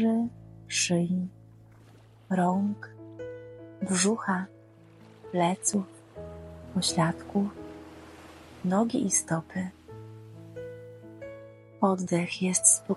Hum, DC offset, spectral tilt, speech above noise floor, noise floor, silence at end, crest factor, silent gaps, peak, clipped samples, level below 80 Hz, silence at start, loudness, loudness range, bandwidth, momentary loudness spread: none; under 0.1%; -4 dB/octave; 27 dB; -54 dBFS; 0 s; 24 dB; none; -6 dBFS; under 0.1%; -62 dBFS; 0 s; -28 LUFS; 3 LU; 14 kHz; 21 LU